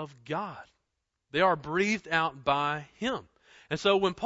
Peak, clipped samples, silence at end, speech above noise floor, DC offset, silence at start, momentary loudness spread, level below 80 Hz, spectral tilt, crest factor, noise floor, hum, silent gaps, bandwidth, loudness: -10 dBFS; under 0.1%; 0 s; 53 dB; under 0.1%; 0 s; 11 LU; -62 dBFS; -4.5 dB/octave; 20 dB; -82 dBFS; none; none; 8 kHz; -29 LUFS